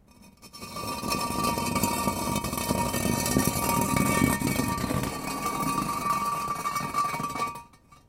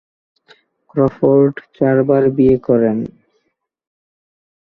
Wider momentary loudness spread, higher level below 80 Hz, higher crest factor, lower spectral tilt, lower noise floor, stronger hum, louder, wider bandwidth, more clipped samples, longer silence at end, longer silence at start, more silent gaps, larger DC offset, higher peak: about the same, 8 LU vs 9 LU; about the same, -46 dBFS vs -48 dBFS; about the same, 20 dB vs 16 dB; second, -4 dB/octave vs -11.5 dB/octave; second, -52 dBFS vs -69 dBFS; neither; second, -27 LUFS vs -14 LUFS; first, 17 kHz vs 4.3 kHz; neither; second, 0.15 s vs 1.6 s; second, 0.25 s vs 0.95 s; neither; neither; second, -8 dBFS vs -2 dBFS